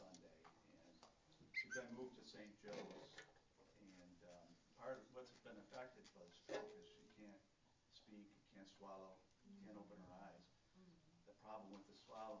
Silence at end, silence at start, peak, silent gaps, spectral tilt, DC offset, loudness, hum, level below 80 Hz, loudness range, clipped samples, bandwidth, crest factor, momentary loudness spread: 0 s; 0 s; -36 dBFS; none; -4 dB/octave; under 0.1%; -58 LUFS; none; -86 dBFS; 8 LU; under 0.1%; 8 kHz; 24 dB; 16 LU